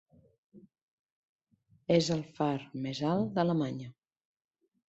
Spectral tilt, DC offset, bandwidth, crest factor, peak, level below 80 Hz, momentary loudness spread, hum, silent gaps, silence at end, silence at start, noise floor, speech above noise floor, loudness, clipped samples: -6.5 dB/octave; under 0.1%; 8.2 kHz; 22 dB; -14 dBFS; -70 dBFS; 14 LU; none; 0.82-1.06 s, 1.12-1.39 s; 1 s; 0.55 s; -69 dBFS; 38 dB; -31 LUFS; under 0.1%